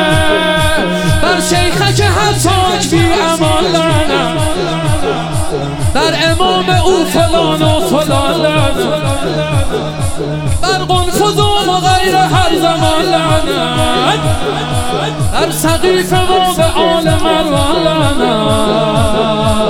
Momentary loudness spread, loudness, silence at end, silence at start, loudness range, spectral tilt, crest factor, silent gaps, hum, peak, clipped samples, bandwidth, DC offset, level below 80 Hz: 5 LU; -12 LUFS; 0 s; 0 s; 2 LU; -4.5 dB/octave; 10 dB; none; none; 0 dBFS; under 0.1%; 17.5 kHz; 1%; -26 dBFS